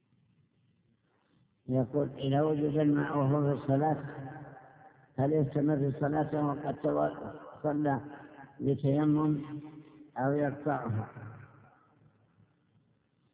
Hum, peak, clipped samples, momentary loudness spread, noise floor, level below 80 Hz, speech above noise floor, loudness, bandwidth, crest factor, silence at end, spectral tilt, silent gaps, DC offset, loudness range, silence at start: none; -16 dBFS; under 0.1%; 17 LU; -72 dBFS; -66 dBFS; 41 dB; -31 LUFS; 4 kHz; 16 dB; 1.85 s; -8.5 dB/octave; none; under 0.1%; 6 LU; 1.7 s